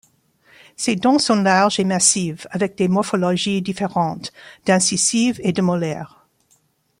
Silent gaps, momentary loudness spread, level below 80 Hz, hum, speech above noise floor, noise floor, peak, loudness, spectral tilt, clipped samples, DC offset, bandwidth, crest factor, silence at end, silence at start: none; 11 LU; -60 dBFS; none; 43 dB; -61 dBFS; -2 dBFS; -18 LUFS; -4 dB/octave; under 0.1%; under 0.1%; 15.5 kHz; 18 dB; 0.95 s; 0.8 s